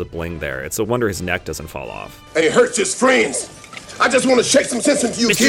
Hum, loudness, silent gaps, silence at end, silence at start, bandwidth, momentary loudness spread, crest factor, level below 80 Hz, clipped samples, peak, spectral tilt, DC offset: none; -17 LUFS; none; 0 s; 0 s; 17.5 kHz; 16 LU; 18 dB; -44 dBFS; under 0.1%; 0 dBFS; -3 dB/octave; under 0.1%